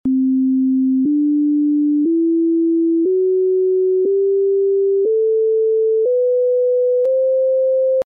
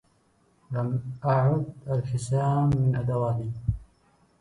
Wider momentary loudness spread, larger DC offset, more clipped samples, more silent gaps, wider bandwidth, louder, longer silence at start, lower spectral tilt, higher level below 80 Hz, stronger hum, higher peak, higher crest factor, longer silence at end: second, 0 LU vs 9 LU; neither; neither; neither; second, 1 kHz vs 11 kHz; first, -16 LUFS vs -27 LUFS; second, 0.05 s vs 0.7 s; second, -4.5 dB/octave vs -8.5 dB/octave; second, -64 dBFS vs -46 dBFS; neither; about the same, -12 dBFS vs -12 dBFS; second, 4 dB vs 14 dB; second, 0.05 s vs 0.55 s